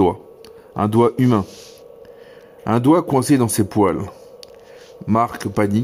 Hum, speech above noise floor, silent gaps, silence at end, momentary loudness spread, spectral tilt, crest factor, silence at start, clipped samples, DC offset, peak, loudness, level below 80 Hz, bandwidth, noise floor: none; 26 dB; none; 0 s; 18 LU; -6.5 dB/octave; 16 dB; 0 s; under 0.1%; under 0.1%; -4 dBFS; -18 LUFS; -52 dBFS; 16 kHz; -43 dBFS